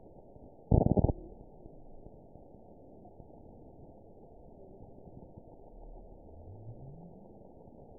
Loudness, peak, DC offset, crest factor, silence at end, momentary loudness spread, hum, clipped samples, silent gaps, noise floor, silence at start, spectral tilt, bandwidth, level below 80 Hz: -30 LUFS; -10 dBFS; under 0.1%; 28 dB; 0 s; 26 LU; none; under 0.1%; none; -55 dBFS; 0.05 s; -7 dB/octave; 1 kHz; -46 dBFS